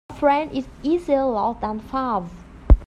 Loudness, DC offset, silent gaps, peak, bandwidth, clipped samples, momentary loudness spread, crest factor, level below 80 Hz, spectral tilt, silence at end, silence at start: -23 LUFS; under 0.1%; none; -2 dBFS; 7.2 kHz; under 0.1%; 9 LU; 20 dB; -24 dBFS; -8.5 dB/octave; 0.05 s; 0.1 s